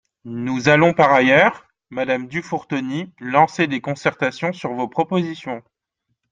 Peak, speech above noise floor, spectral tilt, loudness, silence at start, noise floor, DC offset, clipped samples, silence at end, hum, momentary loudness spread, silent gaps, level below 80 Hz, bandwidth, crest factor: -2 dBFS; 56 dB; -6 dB/octave; -19 LUFS; 0.25 s; -75 dBFS; under 0.1%; under 0.1%; 0.75 s; none; 14 LU; none; -60 dBFS; 9.4 kHz; 18 dB